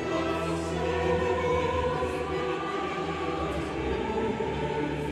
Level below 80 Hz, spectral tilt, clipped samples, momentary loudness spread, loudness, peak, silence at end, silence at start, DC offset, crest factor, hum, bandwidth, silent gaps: -44 dBFS; -6 dB/octave; under 0.1%; 4 LU; -29 LUFS; -16 dBFS; 0 s; 0 s; under 0.1%; 14 dB; none; 13 kHz; none